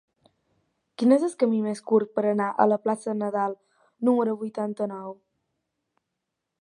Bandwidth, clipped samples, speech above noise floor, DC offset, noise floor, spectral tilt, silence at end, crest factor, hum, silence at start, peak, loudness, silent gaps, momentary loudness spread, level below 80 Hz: 11 kHz; under 0.1%; 59 dB; under 0.1%; -83 dBFS; -7 dB/octave; 1.5 s; 22 dB; none; 1 s; -4 dBFS; -25 LUFS; none; 10 LU; -80 dBFS